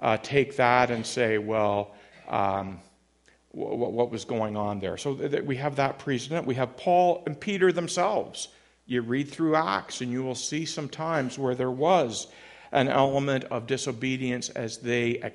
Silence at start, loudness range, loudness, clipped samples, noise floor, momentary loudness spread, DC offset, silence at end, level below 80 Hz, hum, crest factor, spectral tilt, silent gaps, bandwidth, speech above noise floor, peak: 0 s; 4 LU; -27 LUFS; under 0.1%; -63 dBFS; 10 LU; under 0.1%; 0 s; -64 dBFS; none; 22 dB; -5 dB/octave; none; 11.5 kHz; 36 dB; -4 dBFS